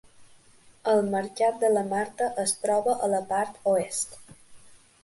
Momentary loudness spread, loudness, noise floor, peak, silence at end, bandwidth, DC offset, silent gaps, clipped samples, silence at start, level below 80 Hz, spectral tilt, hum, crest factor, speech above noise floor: 6 LU; -26 LUFS; -56 dBFS; -12 dBFS; 0.3 s; 12 kHz; under 0.1%; none; under 0.1%; 0.2 s; -68 dBFS; -3.5 dB/octave; none; 16 dB; 30 dB